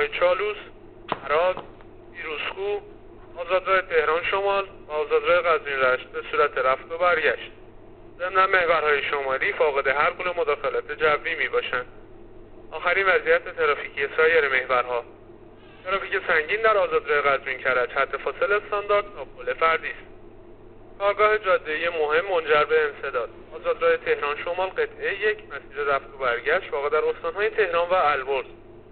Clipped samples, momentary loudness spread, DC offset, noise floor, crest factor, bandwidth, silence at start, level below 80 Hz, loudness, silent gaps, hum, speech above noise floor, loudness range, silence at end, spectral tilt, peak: under 0.1%; 11 LU; 0.2%; -47 dBFS; 18 dB; 4.6 kHz; 0 s; -50 dBFS; -23 LUFS; none; none; 23 dB; 3 LU; 0.1 s; -0.5 dB/octave; -6 dBFS